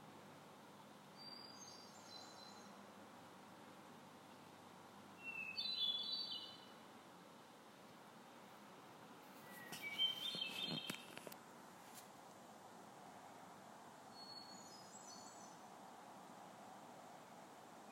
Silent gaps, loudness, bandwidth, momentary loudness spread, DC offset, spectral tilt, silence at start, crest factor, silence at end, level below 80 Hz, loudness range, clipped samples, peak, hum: none; -49 LUFS; 16 kHz; 18 LU; under 0.1%; -2 dB/octave; 0 s; 26 dB; 0 s; under -90 dBFS; 12 LU; under 0.1%; -28 dBFS; none